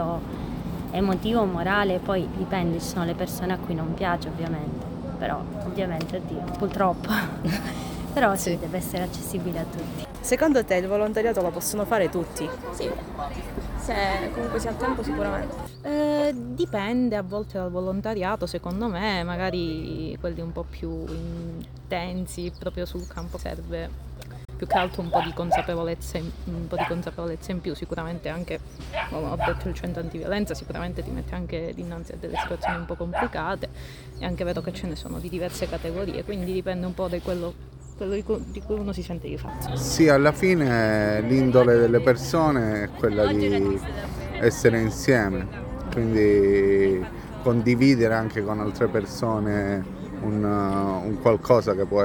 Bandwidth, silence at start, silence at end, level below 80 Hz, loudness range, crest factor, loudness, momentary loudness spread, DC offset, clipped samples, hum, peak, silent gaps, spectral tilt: over 20 kHz; 0 s; 0 s; -40 dBFS; 9 LU; 22 dB; -26 LUFS; 13 LU; under 0.1%; under 0.1%; none; -4 dBFS; none; -6 dB/octave